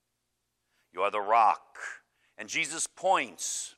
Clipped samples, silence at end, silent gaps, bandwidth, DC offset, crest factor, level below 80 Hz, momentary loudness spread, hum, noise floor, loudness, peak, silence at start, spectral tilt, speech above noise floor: under 0.1%; 0.1 s; none; 14 kHz; under 0.1%; 20 dB; -84 dBFS; 19 LU; none; -81 dBFS; -28 LUFS; -10 dBFS; 0.95 s; -0.5 dB/octave; 52 dB